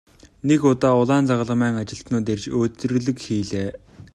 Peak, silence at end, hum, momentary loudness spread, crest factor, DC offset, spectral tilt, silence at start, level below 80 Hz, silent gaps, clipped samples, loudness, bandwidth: -4 dBFS; 0.1 s; none; 10 LU; 16 dB; under 0.1%; -6.5 dB/octave; 0.25 s; -52 dBFS; none; under 0.1%; -21 LUFS; 10.5 kHz